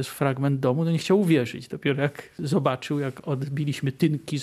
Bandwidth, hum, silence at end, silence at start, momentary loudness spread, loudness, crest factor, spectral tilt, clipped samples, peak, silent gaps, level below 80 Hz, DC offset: 14.5 kHz; none; 0 s; 0 s; 7 LU; -25 LUFS; 18 dB; -7 dB/octave; under 0.1%; -8 dBFS; none; -66 dBFS; under 0.1%